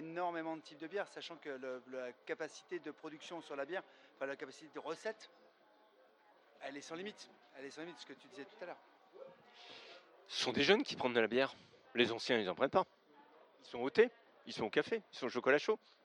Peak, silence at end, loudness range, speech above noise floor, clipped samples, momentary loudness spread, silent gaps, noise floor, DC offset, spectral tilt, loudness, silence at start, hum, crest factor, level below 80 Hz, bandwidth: -14 dBFS; 0.3 s; 16 LU; 30 dB; under 0.1%; 21 LU; none; -69 dBFS; under 0.1%; -4 dB/octave; -39 LUFS; 0 s; none; 26 dB; -84 dBFS; 11 kHz